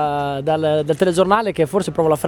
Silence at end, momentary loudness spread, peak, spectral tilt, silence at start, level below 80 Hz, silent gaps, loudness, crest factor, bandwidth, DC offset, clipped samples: 0 s; 4 LU; 0 dBFS; -6 dB/octave; 0 s; -48 dBFS; none; -18 LUFS; 16 dB; 19 kHz; under 0.1%; under 0.1%